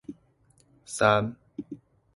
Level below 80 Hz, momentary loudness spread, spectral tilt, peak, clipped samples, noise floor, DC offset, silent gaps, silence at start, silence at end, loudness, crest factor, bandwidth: -60 dBFS; 23 LU; -4.5 dB/octave; -6 dBFS; under 0.1%; -64 dBFS; under 0.1%; none; 0.1 s; 0.4 s; -25 LUFS; 24 dB; 11.5 kHz